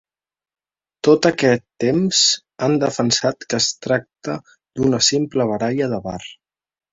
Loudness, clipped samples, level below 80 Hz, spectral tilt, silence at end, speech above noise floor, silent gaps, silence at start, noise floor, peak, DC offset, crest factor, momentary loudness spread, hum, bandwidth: -18 LUFS; under 0.1%; -54 dBFS; -3.5 dB/octave; 0.6 s; over 72 dB; none; 1.05 s; under -90 dBFS; -2 dBFS; under 0.1%; 18 dB; 14 LU; none; 7.8 kHz